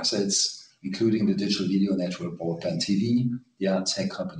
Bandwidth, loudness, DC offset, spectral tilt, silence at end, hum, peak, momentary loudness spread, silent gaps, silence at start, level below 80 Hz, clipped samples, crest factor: 10 kHz; -26 LUFS; under 0.1%; -4.5 dB/octave; 0 s; none; -12 dBFS; 8 LU; none; 0 s; -64 dBFS; under 0.1%; 14 dB